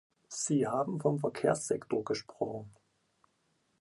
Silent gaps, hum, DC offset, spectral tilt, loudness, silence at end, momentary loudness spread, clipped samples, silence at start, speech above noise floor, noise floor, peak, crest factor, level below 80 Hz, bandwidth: none; none; under 0.1%; -5.5 dB/octave; -33 LUFS; 1.1 s; 8 LU; under 0.1%; 0.3 s; 43 dB; -75 dBFS; -14 dBFS; 20 dB; -72 dBFS; 11.5 kHz